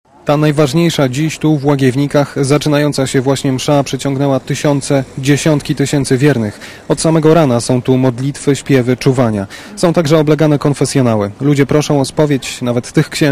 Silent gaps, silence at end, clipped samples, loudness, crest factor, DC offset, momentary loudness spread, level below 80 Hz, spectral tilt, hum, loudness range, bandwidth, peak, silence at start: none; 0 s; 0.3%; -13 LUFS; 12 dB; under 0.1%; 5 LU; -42 dBFS; -6 dB/octave; none; 1 LU; 15.5 kHz; 0 dBFS; 0.25 s